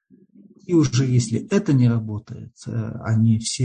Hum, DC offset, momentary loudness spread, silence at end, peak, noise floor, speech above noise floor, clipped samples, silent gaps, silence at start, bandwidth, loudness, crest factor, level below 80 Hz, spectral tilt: none; under 0.1%; 13 LU; 0 s; -8 dBFS; -51 dBFS; 31 dB; under 0.1%; none; 0.7 s; 9.6 kHz; -21 LUFS; 14 dB; -50 dBFS; -6.5 dB/octave